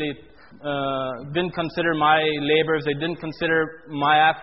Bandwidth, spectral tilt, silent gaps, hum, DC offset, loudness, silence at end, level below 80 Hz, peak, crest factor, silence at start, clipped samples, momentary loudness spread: 5.8 kHz; -2.5 dB/octave; none; none; 0.2%; -22 LUFS; 0 s; -56 dBFS; -4 dBFS; 18 dB; 0 s; under 0.1%; 11 LU